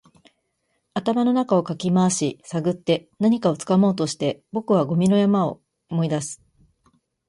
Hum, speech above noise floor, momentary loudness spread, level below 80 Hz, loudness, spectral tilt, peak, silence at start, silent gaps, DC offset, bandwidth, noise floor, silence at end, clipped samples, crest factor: none; 52 dB; 9 LU; -62 dBFS; -22 LUFS; -6 dB/octave; -6 dBFS; 0.95 s; none; under 0.1%; 11.5 kHz; -73 dBFS; 0.95 s; under 0.1%; 16 dB